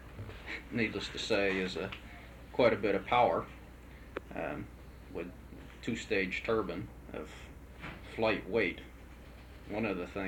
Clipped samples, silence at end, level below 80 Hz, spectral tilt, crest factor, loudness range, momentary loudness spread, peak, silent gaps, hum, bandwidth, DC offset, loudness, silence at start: under 0.1%; 0 s; -52 dBFS; -5.5 dB/octave; 22 dB; 6 LU; 22 LU; -14 dBFS; none; none; 19 kHz; under 0.1%; -34 LUFS; 0 s